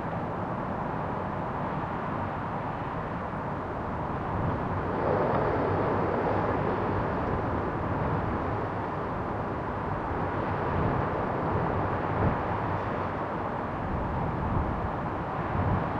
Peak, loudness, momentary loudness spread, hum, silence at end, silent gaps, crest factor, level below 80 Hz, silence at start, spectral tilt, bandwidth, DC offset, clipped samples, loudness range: -14 dBFS; -30 LUFS; 5 LU; none; 0 s; none; 16 dB; -44 dBFS; 0 s; -9 dB/octave; 7.2 kHz; under 0.1%; under 0.1%; 4 LU